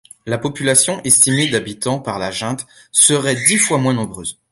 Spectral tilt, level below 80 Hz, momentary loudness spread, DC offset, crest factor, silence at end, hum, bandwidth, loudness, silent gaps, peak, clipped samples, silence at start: -2.5 dB/octave; -52 dBFS; 13 LU; under 0.1%; 18 dB; 0.2 s; none; 16 kHz; -15 LUFS; none; 0 dBFS; under 0.1%; 0.25 s